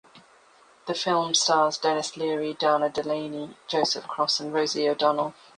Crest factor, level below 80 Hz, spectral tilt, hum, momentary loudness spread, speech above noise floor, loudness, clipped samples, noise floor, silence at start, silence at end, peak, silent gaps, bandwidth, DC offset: 18 dB; -72 dBFS; -2.5 dB/octave; none; 9 LU; 31 dB; -25 LUFS; under 0.1%; -57 dBFS; 0.15 s; 0.25 s; -8 dBFS; none; 10.5 kHz; under 0.1%